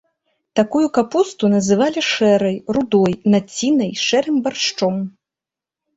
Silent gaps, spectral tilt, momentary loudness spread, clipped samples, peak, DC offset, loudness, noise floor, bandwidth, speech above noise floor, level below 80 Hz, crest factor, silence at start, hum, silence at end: none; -5 dB/octave; 5 LU; under 0.1%; -2 dBFS; under 0.1%; -17 LUFS; -87 dBFS; 8 kHz; 71 dB; -56 dBFS; 16 dB; 0.55 s; none; 0.85 s